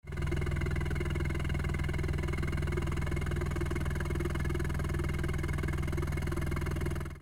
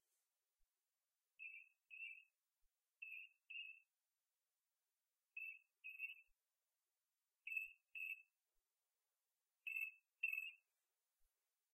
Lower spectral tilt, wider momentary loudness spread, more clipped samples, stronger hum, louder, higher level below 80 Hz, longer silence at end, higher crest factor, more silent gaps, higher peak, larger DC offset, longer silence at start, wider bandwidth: first, -6.5 dB/octave vs 3.5 dB/octave; second, 1 LU vs 12 LU; neither; neither; first, -34 LUFS vs -51 LUFS; first, -36 dBFS vs under -90 dBFS; second, 0 s vs 1.15 s; second, 12 dB vs 24 dB; neither; first, -20 dBFS vs -32 dBFS; neither; second, 0.05 s vs 1.4 s; first, 16 kHz vs 13.5 kHz